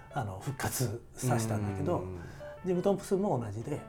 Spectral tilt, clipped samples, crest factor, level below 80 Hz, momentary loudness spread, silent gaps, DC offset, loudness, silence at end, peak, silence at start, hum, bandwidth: -6 dB/octave; under 0.1%; 18 dB; -56 dBFS; 9 LU; none; under 0.1%; -33 LUFS; 0 s; -16 dBFS; 0 s; none; over 20 kHz